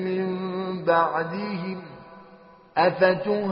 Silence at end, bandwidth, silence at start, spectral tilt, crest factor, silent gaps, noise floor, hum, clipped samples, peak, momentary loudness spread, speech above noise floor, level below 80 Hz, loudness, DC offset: 0 s; 5.6 kHz; 0 s; -4.5 dB/octave; 20 dB; none; -50 dBFS; none; under 0.1%; -6 dBFS; 15 LU; 28 dB; -66 dBFS; -24 LUFS; under 0.1%